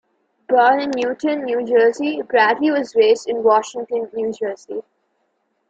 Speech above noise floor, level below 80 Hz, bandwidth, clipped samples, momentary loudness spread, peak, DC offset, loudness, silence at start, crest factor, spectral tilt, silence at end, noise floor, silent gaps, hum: 51 dB; -66 dBFS; 8 kHz; under 0.1%; 10 LU; -2 dBFS; under 0.1%; -18 LUFS; 0.5 s; 16 dB; -4 dB/octave; 0.9 s; -68 dBFS; none; none